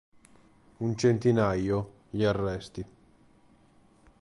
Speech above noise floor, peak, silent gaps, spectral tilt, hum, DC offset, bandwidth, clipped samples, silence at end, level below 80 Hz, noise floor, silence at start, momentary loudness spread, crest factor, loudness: 34 dB; -12 dBFS; none; -7 dB/octave; none; under 0.1%; 11.5 kHz; under 0.1%; 1.35 s; -52 dBFS; -61 dBFS; 0.8 s; 16 LU; 18 dB; -28 LUFS